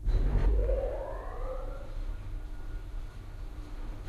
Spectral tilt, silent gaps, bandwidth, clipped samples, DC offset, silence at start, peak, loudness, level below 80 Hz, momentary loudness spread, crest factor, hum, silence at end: -8 dB/octave; none; 4.8 kHz; under 0.1%; under 0.1%; 0 s; -16 dBFS; -37 LUFS; -32 dBFS; 15 LU; 16 dB; none; 0 s